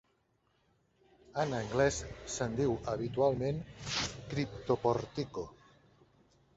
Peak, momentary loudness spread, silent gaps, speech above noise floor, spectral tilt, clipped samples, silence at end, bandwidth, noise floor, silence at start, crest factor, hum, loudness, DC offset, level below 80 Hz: -16 dBFS; 10 LU; none; 41 dB; -5 dB/octave; under 0.1%; 1.05 s; 8.2 kHz; -75 dBFS; 1.3 s; 20 dB; none; -35 LUFS; under 0.1%; -56 dBFS